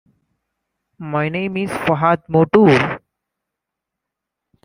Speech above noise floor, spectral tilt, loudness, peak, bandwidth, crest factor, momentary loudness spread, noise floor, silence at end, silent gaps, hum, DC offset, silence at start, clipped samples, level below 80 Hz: 66 dB; -7.5 dB/octave; -16 LUFS; -2 dBFS; 16 kHz; 18 dB; 12 LU; -82 dBFS; 1.65 s; none; none; under 0.1%; 1 s; under 0.1%; -54 dBFS